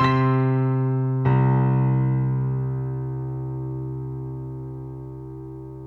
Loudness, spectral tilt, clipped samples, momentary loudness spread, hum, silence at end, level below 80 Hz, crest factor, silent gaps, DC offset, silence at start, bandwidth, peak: -23 LUFS; -10 dB/octave; under 0.1%; 17 LU; none; 0 s; -48 dBFS; 14 dB; none; under 0.1%; 0 s; 4.3 kHz; -8 dBFS